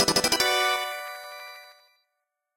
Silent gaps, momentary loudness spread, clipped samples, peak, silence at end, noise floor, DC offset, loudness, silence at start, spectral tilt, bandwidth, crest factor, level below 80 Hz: none; 21 LU; under 0.1%; -6 dBFS; 0.85 s; -81 dBFS; under 0.1%; -23 LUFS; 0 s; -1 dB/octave; 16.5 kHz; 22 dB; -58 dBFS